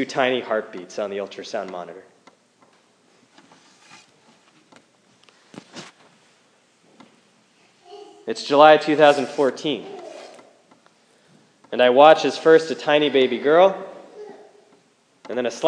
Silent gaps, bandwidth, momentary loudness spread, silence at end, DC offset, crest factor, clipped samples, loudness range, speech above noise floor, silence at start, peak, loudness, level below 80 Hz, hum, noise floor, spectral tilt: none; 10 kHz; 27 LU; 0 s; under 0.1%; 22 dB; under 0.1%; 17 LU; 42 dB; 0 s; 0 dBFS; -18 LUFS; -80 dBFS; none; -60 dBFS; -4.5 dB/octave